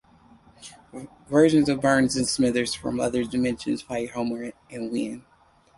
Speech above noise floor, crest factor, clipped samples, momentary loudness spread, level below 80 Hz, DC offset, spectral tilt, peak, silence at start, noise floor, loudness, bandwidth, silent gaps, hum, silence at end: 30 dB; 18 dB; under 0.1%; 22 LU; -54 dBFS; under 0.1%; -4.5 dB/octave; -6 dBFS; 0.6 s; -54 dBFS; -24 LUFS; 11.5 kHz; none; none; 0.6 s